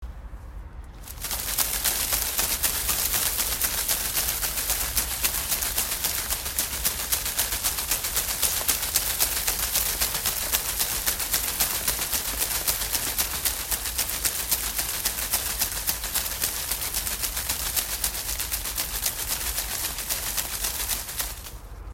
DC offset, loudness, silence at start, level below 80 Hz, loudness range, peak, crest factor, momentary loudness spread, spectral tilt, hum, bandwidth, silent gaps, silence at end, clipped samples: under 0.1%; -24 LUFS; 0 s; -40 dBFS; 3 LU; 0 dBFS; 28 dB; 5 LU; -0.5 dB/octave; none; 16.5 kHz; none; 0 s; under 0.1%